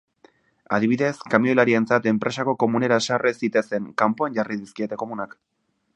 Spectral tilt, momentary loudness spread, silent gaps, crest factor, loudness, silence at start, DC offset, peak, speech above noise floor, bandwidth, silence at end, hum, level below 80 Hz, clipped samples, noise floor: -5.5 dB/octave; 11 LU; none; 22 dB; -22 LUFS; 0.7 s; under 0.1%; 0 dBFS; 36 dB; 9.4 kHz; 0.7 s; none; -66 dBFS; under 0.1%; -58 dBFS